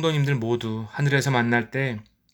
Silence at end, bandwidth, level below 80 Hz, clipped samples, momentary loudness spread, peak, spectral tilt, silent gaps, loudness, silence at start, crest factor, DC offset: 0.3 s; 18 kHz; -60 dBFS; under 0.1%; 8 LU; -6 dBFS; -6 dB/octave; none; -24 LUFS; 0 s; 18 dB; under 0.1%